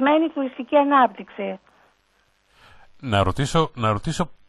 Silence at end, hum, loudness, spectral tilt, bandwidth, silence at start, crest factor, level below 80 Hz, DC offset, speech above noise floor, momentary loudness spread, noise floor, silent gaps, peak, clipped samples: 0.15 s; none; -22 LUFS; -6 dB/octave; 12 kHz; 0 s; 18 dB; -44 dBFS; under 0.1%; 43 dB; 14 LU; -64 dBFS; none; -4 dBFS; under 0.1%